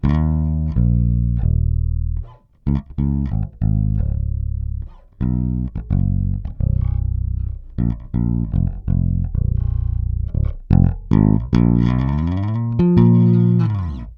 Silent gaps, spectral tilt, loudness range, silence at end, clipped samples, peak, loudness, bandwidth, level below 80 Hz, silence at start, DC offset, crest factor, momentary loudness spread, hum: none; -11 dB/octave; 6 LU; 0.05 s; under 0.1%; 0 dBFS; -19 LUFS; 5.2 kHz; -24 dBFS; 0.05 s; under 0.1%; 16 dB; 9 LU; none